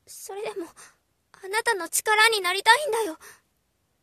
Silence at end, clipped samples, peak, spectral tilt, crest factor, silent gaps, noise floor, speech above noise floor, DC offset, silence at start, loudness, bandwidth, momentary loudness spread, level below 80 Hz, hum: 0.7 s; under 0.1%; -2 dBFS; 1 dB/octave; 24 dB; none; -72 dBFS; 47 dB; under 0.1%; 0.1 s; -22 LUFS; 14 kHz; 19 LU; -74 dBFS; none